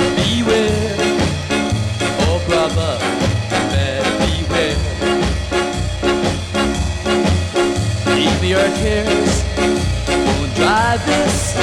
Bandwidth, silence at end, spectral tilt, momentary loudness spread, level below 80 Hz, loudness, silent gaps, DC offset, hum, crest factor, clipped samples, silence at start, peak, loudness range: 13.5 kHz; 0 s; -5 dB/octave; 4 LU; -28 dBFS; -17 LUFS; none; under 0.1%; none; 14 dB; under 0.1%; 0 s; -2 dBFS; 2 LU